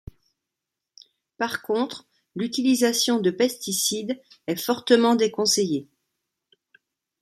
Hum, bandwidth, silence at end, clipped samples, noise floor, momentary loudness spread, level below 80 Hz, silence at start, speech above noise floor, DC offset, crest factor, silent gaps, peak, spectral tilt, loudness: none; 15.5 kHz; 1.4 s; under 0.1%; -86 dBFS; 12 LU; -60 dBFS; 1.4 s; 63 dB; under 0.1%; 20 dB; none; -4 dBFS; -3 dB/octave; -23 LUFS